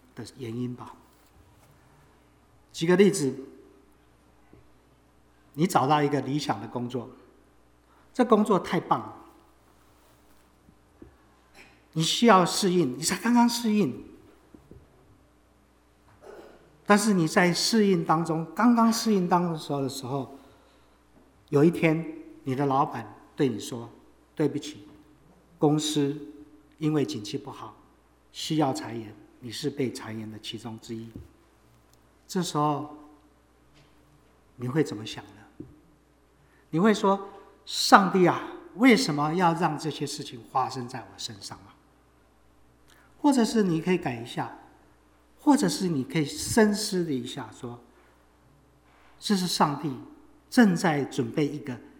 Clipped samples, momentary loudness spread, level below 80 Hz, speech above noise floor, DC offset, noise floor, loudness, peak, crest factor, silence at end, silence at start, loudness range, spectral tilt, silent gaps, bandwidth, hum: under 0.1%; 20 LU; -64 dBFS; 36 dB; under 0.1%; -61 dBFS; -26 LUFS; 0 dBFS; 28 dB; 0.1 s; 0.15 s; 11 LU; -5 dB/octave; none; over 20 kHz; none